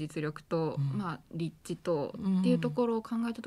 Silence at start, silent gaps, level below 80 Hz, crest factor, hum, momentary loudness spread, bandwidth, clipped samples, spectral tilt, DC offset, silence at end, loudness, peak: 0 s; none; -66 dBFS; 16 dB; none; 10 LU; 12.5 kHz; under 0.1%; -8 dB/octave; under 0.1%; 0 s; -33 LUFS; -16 dBFS